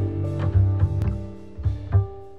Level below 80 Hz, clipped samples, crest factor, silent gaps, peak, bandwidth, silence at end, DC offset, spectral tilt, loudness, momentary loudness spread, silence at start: -32 dBFS; under 0.1%; 14 dB; none; -8 dBFS; 4 kHz; 0 s; 0.8%; -10 dB/octave; -24 LUFS; 9 LU; 0 s